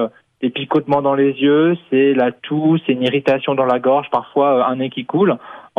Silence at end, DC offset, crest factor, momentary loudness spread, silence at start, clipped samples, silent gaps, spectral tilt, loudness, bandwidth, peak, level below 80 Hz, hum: 0.15 s; under 0.1%; 14 dB; 8 LU; 0 s; under 0.1%; none; -8.5 dB/octave; -16 LUFS; 5.8 kHz; -2 dBFS; -62 dBFS; none